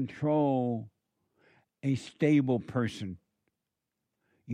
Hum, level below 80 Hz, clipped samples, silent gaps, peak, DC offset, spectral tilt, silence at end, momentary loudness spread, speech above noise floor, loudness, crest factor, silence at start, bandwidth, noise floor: none; -70 dBFS; under 0.1%; none; -14 dBFS; under 0.1%; -8 dB/octave; 0 s; 15 LU; 57 dB; -30 LUFS; 18 dB; 0 s; 10 kHz; -86 dBFS